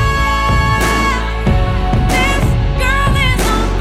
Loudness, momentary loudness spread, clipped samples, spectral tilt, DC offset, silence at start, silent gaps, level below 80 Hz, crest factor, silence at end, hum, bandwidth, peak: -14 LUFS; 2 LU; under 0.1%; -5 dB/octave; under 0.1%; 0 s; none; -16 dBFS; 10 dB; 0 s; none; 15.5 kHz; -2 dBFS